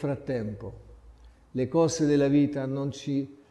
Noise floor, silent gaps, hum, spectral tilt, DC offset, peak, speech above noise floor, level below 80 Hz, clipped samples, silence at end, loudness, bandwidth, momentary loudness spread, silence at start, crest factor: -53 dBFS; none; none; -6.5 dB/octave; under 0.1%; -12 dBFS; 26 dB; -54 dBFS; under 0.1%; 0.15 s; -27 LUFS; 11.5 kHz; 14 LU; 0 s; 16 dB